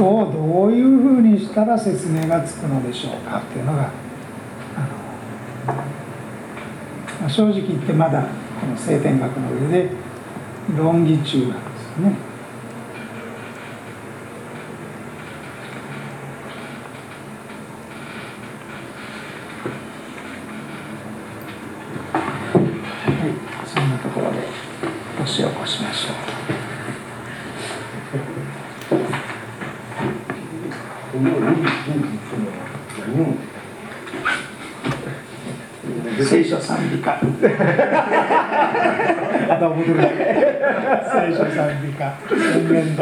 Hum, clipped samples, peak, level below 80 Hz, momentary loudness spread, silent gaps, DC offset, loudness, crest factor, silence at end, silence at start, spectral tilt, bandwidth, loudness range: none; under 0.1%; 0 dBFS; -58 dBFS; 17 LU; none; under 0.1%; -20 LUFS; 20 dB; 0 s; 0 s; -6.5 dB/octave; 17 kHz; 16 LU